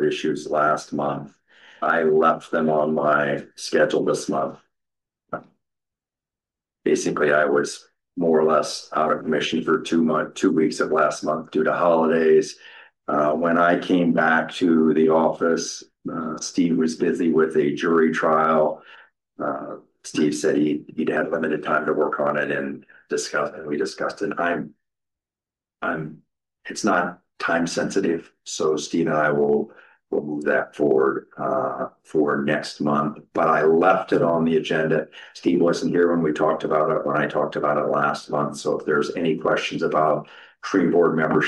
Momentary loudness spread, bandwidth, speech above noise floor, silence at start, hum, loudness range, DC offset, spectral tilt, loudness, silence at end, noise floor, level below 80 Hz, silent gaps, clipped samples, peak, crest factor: 11 LU; 12 kHz; over 69 dB; 0 s; none; 6 LU; under 0.1%; -5 dB/octave; -22 LUFS; 0 s; under -90 dBFS; -66 dBFS; none; under 0.1%; -6 dBFS; 16 dB